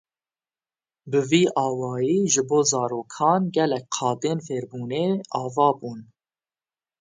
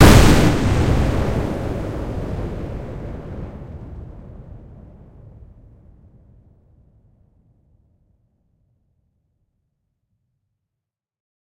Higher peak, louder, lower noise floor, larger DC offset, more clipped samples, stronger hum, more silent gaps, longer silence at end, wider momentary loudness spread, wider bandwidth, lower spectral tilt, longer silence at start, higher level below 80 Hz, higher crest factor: second, -4 dBFS vs 0 dBFS; second, -23 LUFS vs -19 LUFS; first, under -90 dBFS vs -84 dBFS; neither; neither; neither; neither; second, 0.95 s vs 5.35 s; second, 10 LU vs 26 LU; second, 10 kHz vs 16.5 kHz; second, -4.5 dB/octave vs -6 dB/octave; first, 1.05 s vs 0 s; second, -70 dBFS vs -28 dBFS; about the same, 20 dB vs 20 dB